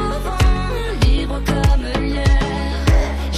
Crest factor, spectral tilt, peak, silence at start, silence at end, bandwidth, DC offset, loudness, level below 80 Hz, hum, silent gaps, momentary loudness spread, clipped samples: 14 dB; -6 dB/octave; -4 dBFS; 0 s; 0 s; 14 kHz; under 0.1%; -19 LUFS; -18 dBFS; none; none; 4 LU; under 0.1%